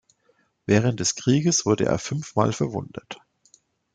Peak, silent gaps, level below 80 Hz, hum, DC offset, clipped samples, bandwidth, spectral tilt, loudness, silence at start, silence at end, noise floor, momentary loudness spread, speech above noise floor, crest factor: -4 dBFS; none; -58 dBFS; none; under 0.1%; under 0.1%; 10 kHz; -5 dB/octave; -23 LUFS; 0.7 s; 0.8 s; -66 dBFS; 18 LU; 43 dB; 20 dB